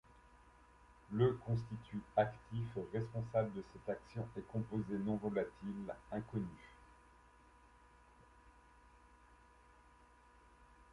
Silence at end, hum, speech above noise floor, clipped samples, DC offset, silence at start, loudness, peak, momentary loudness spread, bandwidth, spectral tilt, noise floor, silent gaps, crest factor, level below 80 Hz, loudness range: 0.1 s; none; 25 dB; under 0.1%; under 0.1%; 0.25 s; -41 LUFS; -20 dBFS; 12 LU; 11 kHz; -9 dB/octave; -66 dBFS; none; 22 dB; -66 dBFS; 11 LU